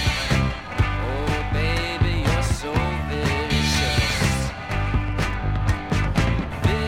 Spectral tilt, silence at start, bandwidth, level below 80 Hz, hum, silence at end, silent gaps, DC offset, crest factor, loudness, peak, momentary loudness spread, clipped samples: -5 dB/octave; 0 s; 16 kHz; -28 dBFS; none; 0 s; none; under 0.1%; 16 dB; -23 LUFS; -6 dBFS; 5 LU; under 0.1%